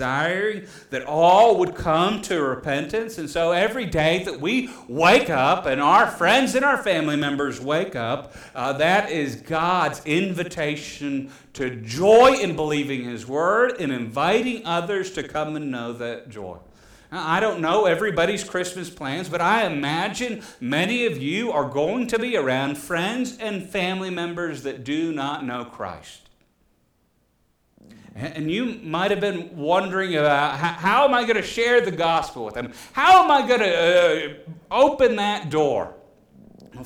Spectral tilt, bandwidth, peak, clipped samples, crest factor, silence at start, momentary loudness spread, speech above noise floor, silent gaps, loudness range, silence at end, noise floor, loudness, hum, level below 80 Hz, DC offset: -4.5 dB/octave; 18 kHz; -6 dBFS; under 0.1%; 16 dB; 0 s; 14 LU; 44 dB; none; 9 LU; 0 s; -65 dBFS; -21 LUFS; none; -52 dBFS; under 0.1%